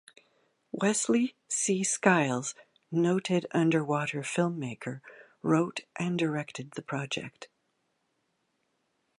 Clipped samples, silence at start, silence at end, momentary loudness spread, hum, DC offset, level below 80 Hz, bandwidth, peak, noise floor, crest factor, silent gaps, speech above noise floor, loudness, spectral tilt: under 0.1%; 0.75 s; 1.75 s; 13 LU; none; under 0.1%; -76 dBFS; 11.5 kHz; -6 dBFS; -77 dBFS; 24 dB; none; 48 dB; -29 LUFS; -4.5 dB/octave